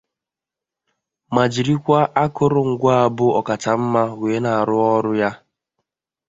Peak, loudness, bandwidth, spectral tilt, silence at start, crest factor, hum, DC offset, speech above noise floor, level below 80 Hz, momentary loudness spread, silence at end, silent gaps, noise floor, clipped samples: 0 dBFS; -18 LUFS; 7.8 kHz; -7 dB/octave; 1.3 s; 18 dB; none; under 0.1%; 70 dB; -56 dBFS; 5 LU; 0.9 s; none; -87 dBFS; under 0.1%